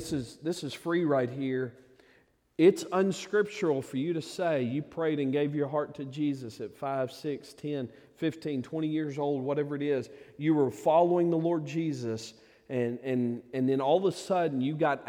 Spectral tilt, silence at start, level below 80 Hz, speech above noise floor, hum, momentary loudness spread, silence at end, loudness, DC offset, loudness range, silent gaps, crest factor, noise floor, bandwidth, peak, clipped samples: -6.5 dB/octave; 0 s; -70 dBFS; 36 dB; none; 11 LU; 0 s; -30 LUFS; under 0.1%; 5 LU; none; 20 dB; -65 dBFS; 15.5 kHz; -10 dBFS; under 0.1%